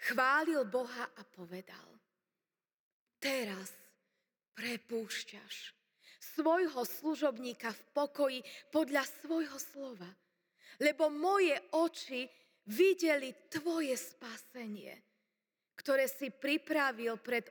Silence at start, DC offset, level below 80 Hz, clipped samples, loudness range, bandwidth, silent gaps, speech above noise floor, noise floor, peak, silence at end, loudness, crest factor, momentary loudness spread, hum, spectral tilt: 0 s; under 0.1%; under -90 dBFS; under 0.1%; 9 LU; over 20 kHz; 2.74-3.07 s, 4.48-4.52 s; over 54 dB; under -90 dBFS; -18 dBFS; 0 s; -35 LUFS; 20 dB; 17 LU; none; -3 dB/octave